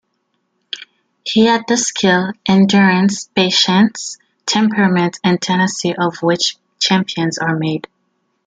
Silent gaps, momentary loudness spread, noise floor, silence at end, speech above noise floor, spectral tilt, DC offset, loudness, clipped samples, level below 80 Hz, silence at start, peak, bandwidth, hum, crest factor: none; 14 LU; -68 dBFS; 0.65 s; 53 dB; -4 dB/octave; under 0.1%; -15 LUFS; under 0.1%; -58 dBFS; 0.75 s; 0 dBFS; 9.4 kHz; none; 14 dB